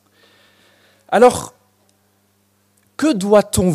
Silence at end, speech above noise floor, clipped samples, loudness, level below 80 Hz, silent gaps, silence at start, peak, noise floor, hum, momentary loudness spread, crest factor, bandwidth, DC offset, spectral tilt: 0 s; 47 dB; under 0.1%; -15 LUFS; -44 dBFS; none; 1.1 s; 0 dBFS; -60 dBFS; none; 19 LU; 18 dB; 15.5 kHz; under 0.1%; -5.5 dB/octave